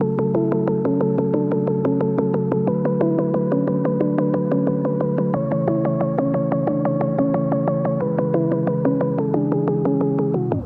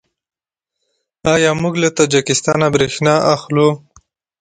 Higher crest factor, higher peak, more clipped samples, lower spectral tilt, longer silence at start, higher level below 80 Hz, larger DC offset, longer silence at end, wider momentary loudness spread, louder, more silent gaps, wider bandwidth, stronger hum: about the same, 14 dB vs 16 dB; second, -4 dBFS vs 0 dBFS; neither; first, -13 dB/octave vs -4.5 dB/octave; second, 0 s vs 1.25 s; second, -58 dBFS vs -48 dBFS; neither; second, 0 s vs 0.65 s; about the same, 1 LU vs 3 LU; second, -20 LUFS vs -14 LUFS; neither; second, 3.7 kHz vs 9.6 kHz; neither